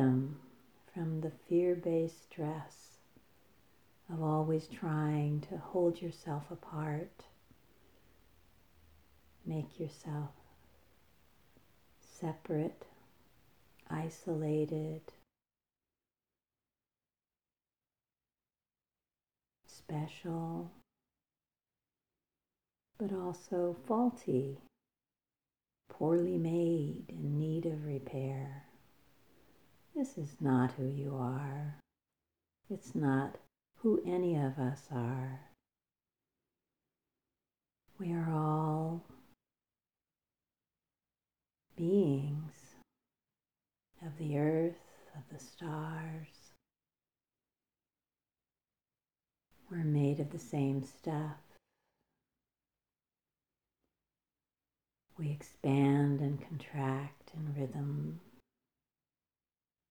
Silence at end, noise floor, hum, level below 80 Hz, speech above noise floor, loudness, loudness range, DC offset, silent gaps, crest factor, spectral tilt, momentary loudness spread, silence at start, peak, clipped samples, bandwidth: 1.7 s; under -90 dBFS; none; -76 dBFS; over 54 dB; -37 LUFS; 11 LU; under 0.1%; none; 20 dB; -8.5 dB/octave; 15 LU; 0 s; -20 dBFS; under 0.1%; 19.5 kHz